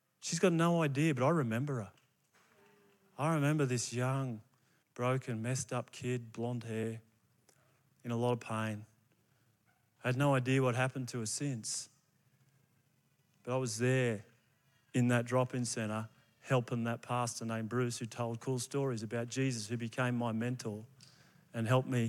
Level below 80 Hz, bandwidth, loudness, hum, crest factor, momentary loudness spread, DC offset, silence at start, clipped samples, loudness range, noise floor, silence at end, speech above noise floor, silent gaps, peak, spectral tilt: -82 dBFS; 14.5 kHz; -35 LUFS; none; 20 dB; 11 LU; under 0.1%; 0.2 s; under 0.1%; 5 LU; -74 dBFS; 0 s; 40 dB; none; -16 dBFS; -5.5 dB/octave